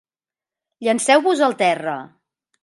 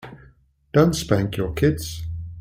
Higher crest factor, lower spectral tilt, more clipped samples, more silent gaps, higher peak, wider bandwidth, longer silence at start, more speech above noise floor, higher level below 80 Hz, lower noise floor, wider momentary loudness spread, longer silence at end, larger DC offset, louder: about the same, 18 dB vs 18 dB; second, -3 dB/octave vs -6 dB/octave; neither; neither; about the same, -2 dBFS vs -4 dBFS; second, 11.5 kHz vs 16.5 kHz; first, 0.8 s vs 0.05 s; first, over 72 dB vs 34 dB; second, -76 dBFS vs -40 dBFS; first, under -90 dBFS vs -54 dBFS; about the same, 12 LU vs 14 LU; first, 0.55 s vs 0 s; neither; first, -18 LUFS vs -22 LUFS